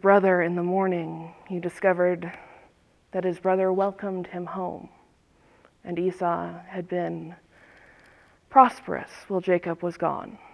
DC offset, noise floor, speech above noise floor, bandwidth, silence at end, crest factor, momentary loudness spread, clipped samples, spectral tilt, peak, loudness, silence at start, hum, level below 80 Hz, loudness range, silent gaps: under 0.1%; -61 dBFS; 36 dB; 11 kHz; 0.15 s; 24 dB; 17 LU; under 0.1%; -8 dB/octave; -2 dBFS; -26 LUFS; 0 s; none; -66 dBFS; 7 LU; none